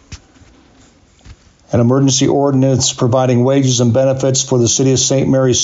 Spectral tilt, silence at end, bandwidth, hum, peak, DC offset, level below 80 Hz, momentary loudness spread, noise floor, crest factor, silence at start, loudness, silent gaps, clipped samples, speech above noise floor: -5 dB/octave; 0 s; 8 kHz; none; -4 dBFS; under 0.1%; -44 dBFS; 2 LU; -47 dBFS; 10 dB; 0.1 s; -12 LUFS; none; under 0.1%; 35 dB